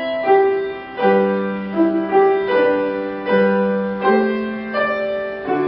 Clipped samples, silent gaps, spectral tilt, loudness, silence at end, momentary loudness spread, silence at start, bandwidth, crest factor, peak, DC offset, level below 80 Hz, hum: under 0.1%; none; -11.5 dB/octave; -18 LUFS; 0 s; 8 LU; 0 s; 5.6 kHz; 14 dB; -2 dBFS; under 0.1%; -56 dBFS; none